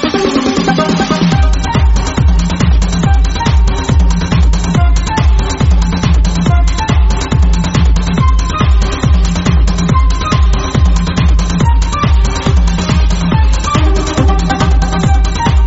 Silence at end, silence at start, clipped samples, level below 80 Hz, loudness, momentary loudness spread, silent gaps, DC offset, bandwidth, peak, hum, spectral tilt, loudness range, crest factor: 0 s; 0 s; under 0.1%; -12 dBFS; -12 LUFS; 1 LU; none; under 0.1%; 8 kHz; 0 dBFS; none; -6 dB/octave; 0 LU; 10 dB